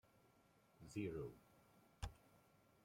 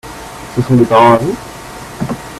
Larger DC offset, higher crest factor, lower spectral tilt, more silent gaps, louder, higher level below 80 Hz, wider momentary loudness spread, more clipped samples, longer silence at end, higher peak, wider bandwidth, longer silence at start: neither; first, 22 dB vs 14 dB; about the same, -6.5 dB/octave vs -6.5 dB/octave; neither; second, -52 LUFS vs -11 LUFS; second, -66 dBFS vs -40 dBFS; second, 16 LU vs 21 LU; neither; first, 0.45 s vs 0 s; second, -34 dBFS vs 0 dBFS; first, 16.5 kHz vs 14.5 kHz; first, 0.25 s vs 0.05 s